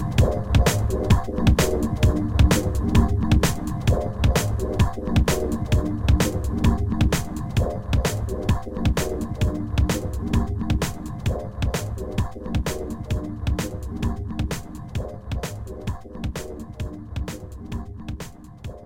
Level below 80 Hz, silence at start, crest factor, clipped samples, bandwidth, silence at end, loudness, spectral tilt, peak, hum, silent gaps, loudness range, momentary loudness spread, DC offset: -28 dBFS; 0 s; 18 dB; under 0.1%; 16.5 kHz; 0 s; -24 LUFS; -6 dB/octave; -4 dBFS; none; none; 11 LU; 13 LU; 0.4%